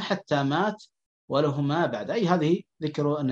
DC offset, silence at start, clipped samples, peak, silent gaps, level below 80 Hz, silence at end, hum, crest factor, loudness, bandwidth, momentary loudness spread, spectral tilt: under 0.1%; 0 s; under 0.1%; -6 dBFS; 1.06-1.28 s; -70 dBFS; 0 s; none; 20 dB; -26 LUFS; 7.8 kHz; 6 LU; -7 dB/octave